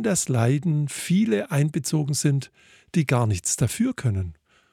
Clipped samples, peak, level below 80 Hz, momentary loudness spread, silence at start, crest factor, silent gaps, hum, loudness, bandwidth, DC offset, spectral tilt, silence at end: under 0.1%; -6 dBFS; -54 dBFS; 6 LU; 0 s; 18 dB; none; none; -23 LUFS; 16 kHz; under 0.1%; -5.5 dB/octave; 0.4 s